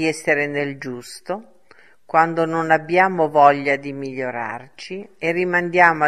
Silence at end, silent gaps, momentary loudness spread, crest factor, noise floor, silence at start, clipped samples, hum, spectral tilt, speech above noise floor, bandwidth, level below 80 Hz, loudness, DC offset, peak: 0 s; none; 17 LU; 20 dB; -53 dBFS; 0 s; under 0.1%; none; -5.5 dB/octave; 34 dB; 13.5 kHz; -66 dBFS; -19 LUFS; 0.3%; 0 dBFS